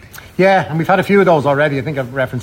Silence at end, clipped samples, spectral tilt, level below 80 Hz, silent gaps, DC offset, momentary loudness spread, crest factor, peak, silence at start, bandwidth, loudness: 0 s; under 0.1%; -7 dB/octave; -48 dBFS; none; under 0.1%; 9 LU; 12 dB; -2 dBFS; 0.15 s; 16.5 kHz; -14 LUFS